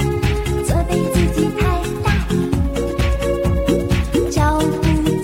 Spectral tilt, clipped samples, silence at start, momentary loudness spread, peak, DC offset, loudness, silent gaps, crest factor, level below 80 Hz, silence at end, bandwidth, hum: -6.5 dB/octave; under 0.1%; 0 s; 3 LU; -2 dBFS; under 0.1%; -18 LUFS; none; 14 dB; -22 dBFS; 0 s; 16.5 kHz; none